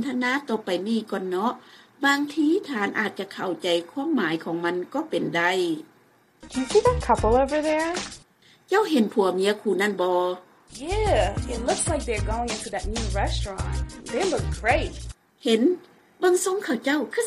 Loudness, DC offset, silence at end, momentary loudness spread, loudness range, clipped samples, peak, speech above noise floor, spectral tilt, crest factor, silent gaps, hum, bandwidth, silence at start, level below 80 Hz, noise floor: -25 LUFS; under 0.1%; 0 s; 10 LU; 3 LU; under 0.1%; -6 dBFS; 35 dB; -4.5 dB/octave; 18 dB; none; none; 15 kHz; 0 s; -38 dBFS; -59 dBFS